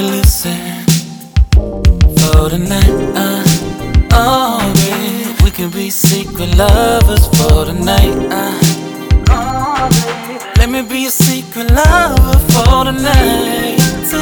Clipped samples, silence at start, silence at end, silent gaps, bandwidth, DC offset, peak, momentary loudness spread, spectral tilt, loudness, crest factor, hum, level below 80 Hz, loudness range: 0.5%; 0 s; 0 s; none; over 20 kHz; under 0.1%; 0 dBFS; 7 LU; -5 dB/octave; -11 LUFS; 10 dB; none; -14 dBFS; 2 LU